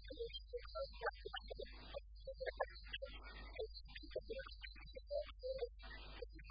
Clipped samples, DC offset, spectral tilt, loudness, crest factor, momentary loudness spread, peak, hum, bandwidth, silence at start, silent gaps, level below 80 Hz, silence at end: under 0.1%; under 0.1%; -2 dB/octave; -50 LUFS; 24 dB; 9 LU; -26 dBFS; none; 5 kHz; 0 s; none; -56 dBFS; 0 s